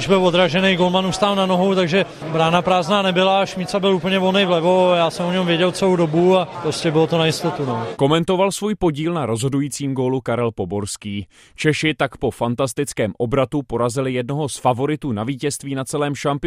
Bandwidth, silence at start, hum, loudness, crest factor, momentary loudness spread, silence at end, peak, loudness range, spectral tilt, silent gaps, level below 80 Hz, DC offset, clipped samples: 15 kHz; 0 s; none; -19 LUFS; 16 dB; 7 LU; 0 s; -2 dBFS; 5 LU; -5 dB/octave; none; -48 dBFS; under 0.1%; under 0.1%